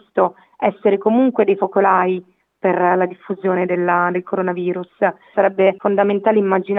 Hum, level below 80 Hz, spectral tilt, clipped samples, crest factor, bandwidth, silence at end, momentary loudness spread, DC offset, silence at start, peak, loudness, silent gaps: none; -68 dBFS; -9.5 dB/octave; under 0.1%; 16 dB; 3.9 kHz; 0 s; 7 LU; under 0.1%; 0.15 s; 0 dBFS; -17 LUFS; none